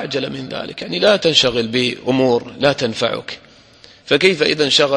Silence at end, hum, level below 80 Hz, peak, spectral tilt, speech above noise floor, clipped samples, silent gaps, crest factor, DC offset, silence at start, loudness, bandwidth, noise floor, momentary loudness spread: 0 s; none; -52 dBFS; 0 dBFS; -4 dB/octave; 29 dB; under 0.1%; none; 18 dB; under 0.1%; 0 s; -16 LUFS; 11.5 kHz; -46 dBFS; 13 LU